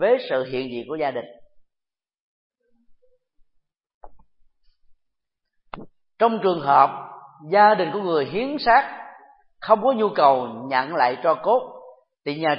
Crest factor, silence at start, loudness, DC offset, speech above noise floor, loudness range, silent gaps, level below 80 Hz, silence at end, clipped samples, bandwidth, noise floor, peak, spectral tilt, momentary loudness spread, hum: 22 dB; 0 s; -20 LUFS; under 0.1%; 66 dB; 12 LU; 2.20-2.50 s, 3.94-4.01 s; -58 dBFS; 0 s; under 0.1%; 5.6 kHz; -86 dBFS; -2 dBFS; -9.5 dB/octave; 21 LU; none